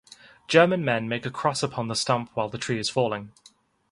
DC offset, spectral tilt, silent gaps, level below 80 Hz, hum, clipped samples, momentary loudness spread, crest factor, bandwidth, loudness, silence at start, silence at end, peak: under 0.1%; -4.5 dB/octave; none; -62 dBFS; none; under 0.1%; 10 LU; 24 dB; 11.5 kHz; -25 LUFS; 0.5 s; 0.65 s; -2 dBFS